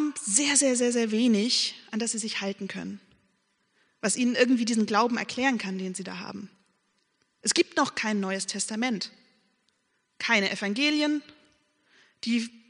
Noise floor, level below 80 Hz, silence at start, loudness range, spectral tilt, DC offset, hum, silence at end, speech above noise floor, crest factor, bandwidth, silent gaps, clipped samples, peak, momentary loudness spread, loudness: -74 dBFS; -76 dBFS; 0 s; 3 LU; -2.5 dB/octave; under 0.1%; none; 0.1 s; 47 dB; 22 dB; 10.5 kHz; none; under 0.1%; -6 dBFS; 13 LU; -26 LUFS